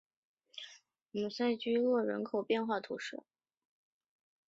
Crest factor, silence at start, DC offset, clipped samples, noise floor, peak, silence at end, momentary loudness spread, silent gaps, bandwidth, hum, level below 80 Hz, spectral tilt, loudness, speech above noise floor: 18 dB; 0.55 s; under 0.1%; under 0.1%; -59 dBFS; -20 dBFS; 1.3 s; 18 LU; none; 7.8 kHz; none; -84 dBFS; -3.5 dB/octave; -35 LUFS; 25 dB